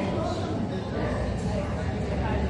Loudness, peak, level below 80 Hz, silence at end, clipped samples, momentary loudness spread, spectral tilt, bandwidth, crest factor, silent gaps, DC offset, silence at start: -29 LUFS; -14 dBFS; -36 dBFS; 0 s; under 0.1%; 2 LU; -7 dB/octave; 10.5 kHz; 12 dB; none; under 0.1%; 0 s